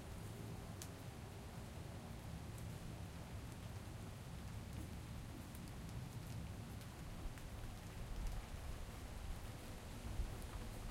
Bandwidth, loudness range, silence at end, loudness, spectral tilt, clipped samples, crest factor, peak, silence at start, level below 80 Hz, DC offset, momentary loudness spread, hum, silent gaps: 16 kHz; 1 LU; 0 s; -52 LUFS; -5.5 dB/octave; under 0.1%; 20 dB; -28 dBFS; 0 s; -54 dBFS; under 0.1%; 3 LU; none; none